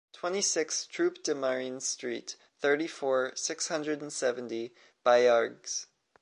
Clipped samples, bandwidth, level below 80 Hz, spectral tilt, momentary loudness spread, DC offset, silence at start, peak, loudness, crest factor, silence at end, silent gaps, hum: under 0.1%; 11.5 kHz; -86 dBFS; -2 dB/octave; 12 LU; under 0.1%; 0.15 s; -12 dBFS; -30 LUFS; 20 dB; 0.4 s; none; none